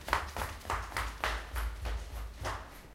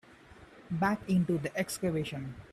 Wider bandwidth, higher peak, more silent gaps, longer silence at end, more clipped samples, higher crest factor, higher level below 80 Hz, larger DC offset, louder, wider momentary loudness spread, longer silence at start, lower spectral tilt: first, 16.5 kHz vs 14.5 kHz; first, -10 dBFS vs -16 dBFS; neither; about the same, 0 s vs 0.05 s; neither; first, 28 dB vs 16 dB; first, -42 dBFS vs -60 dBFS; neither; second, -38 LUFS vs -32 LUFS; second, 7 LU vs 10 LU; about the same, 0 s vs 0.1 s; second, -3.5 dB/octave vs -6 dB/octave